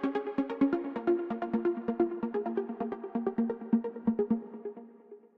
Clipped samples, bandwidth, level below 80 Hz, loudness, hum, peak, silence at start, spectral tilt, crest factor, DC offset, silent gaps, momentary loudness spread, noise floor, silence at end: under 0.1%; 4.8 kHz; -68 dBFS; -32 LUFS; none; -16 dBFS; 0 s; -9.5 dB/octave; 16 dB; under 0.1%; none; 9 LU; -54 dBFS; 0.2 s